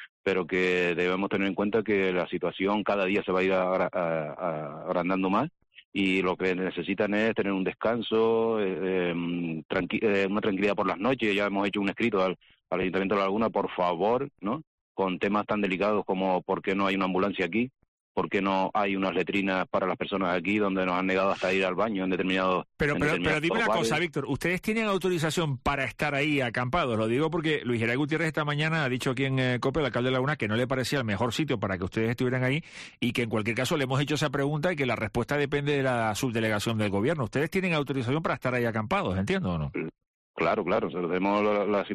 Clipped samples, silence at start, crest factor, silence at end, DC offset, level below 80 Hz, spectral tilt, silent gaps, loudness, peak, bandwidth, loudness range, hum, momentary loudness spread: under 0.1%; 0 s; 12 dB; 0 s; under 0.1%; -54 dBFS; -6 dB/octave; 0.09-0.24 s, 5.85-5.92 s, 9.65-9.69 s, 14.67-14.95 s, 17.88-18.15 s, 40.07-40.34 s; -27 LUFS; -16 dBFS; 13 kHz; 2 LU; none; 5 LU